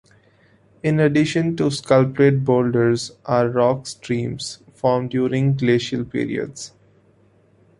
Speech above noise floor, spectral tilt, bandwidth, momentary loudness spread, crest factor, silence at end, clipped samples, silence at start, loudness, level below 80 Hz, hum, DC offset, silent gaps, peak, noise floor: 37 dB; -6.5 dB/octave; 11.5 kHz; 10 LU; 18 dB; 1.1 s; under 0.1%; 0.85 s; -20 LUFS; -56 dBFS; none; under 0.1%; none; -2 dBFS; -56 dBFS